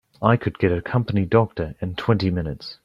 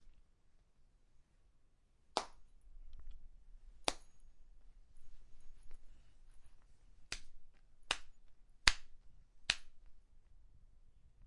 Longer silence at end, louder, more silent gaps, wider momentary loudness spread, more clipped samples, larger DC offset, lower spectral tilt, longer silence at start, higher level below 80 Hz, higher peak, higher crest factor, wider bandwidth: about the same, 0.1 s vs 0 s; first, -22 LUFS vs -40 LUFS; neither; second, 8 LU vs 27 LU; neither; neither; first, -9 dB/octave vs -0.5 dB/octave; first, 0.2 s vs 0 s; first, -46 dBFS vs -56 dBFS; about the same, -2 dBFS vs -2 dBFS; second, 20 dB vs 44 dB; second, 6 kHz vs 11.5 kHz